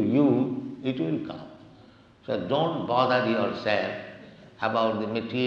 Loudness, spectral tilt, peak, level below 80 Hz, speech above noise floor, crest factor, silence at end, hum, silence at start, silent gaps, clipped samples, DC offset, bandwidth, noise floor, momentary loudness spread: -26 LUFS; -7.5 dB/octave; -8 dBFS; -68 dBFS; 27 dB; 18 dB; 0 s; none; 0 s; none; under 0.1%; under 0.1%; 7 kHz; -53 dBFS; 17 LU